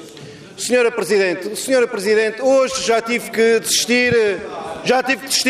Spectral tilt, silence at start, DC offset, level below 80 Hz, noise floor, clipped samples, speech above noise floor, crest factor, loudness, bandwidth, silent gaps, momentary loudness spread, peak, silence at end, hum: -2.5 dB/octave; 0 s; under 0.1%; -56 dBFS; -37 dBFS; under 0.1%; 20 dB; 12 dB; -17 LUFS; 15.5 kHz; none; 11 LU; -4 dBFS; 0 s; none